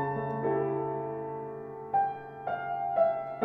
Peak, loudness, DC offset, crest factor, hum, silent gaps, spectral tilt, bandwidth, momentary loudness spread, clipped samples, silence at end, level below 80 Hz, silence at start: -14 dBFS; -32 LUFS; under 0.1%; 18 dB; none; none; -10 dB/octave; 4.3 kHz; 11 LU; under 0.1%; 0 s; -70 dBFS; 0 s